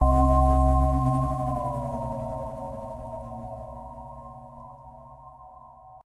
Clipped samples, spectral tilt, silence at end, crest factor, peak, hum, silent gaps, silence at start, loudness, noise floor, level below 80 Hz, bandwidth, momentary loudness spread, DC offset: under 0.1%; -9.5 dB/octave; 0.05 s; 18 dB; -8 dBFS; none; none; 0 s; -26 LUFS; -48 dBFS; -30 dBFS; 11 kHz; 26 LU; under 0.1%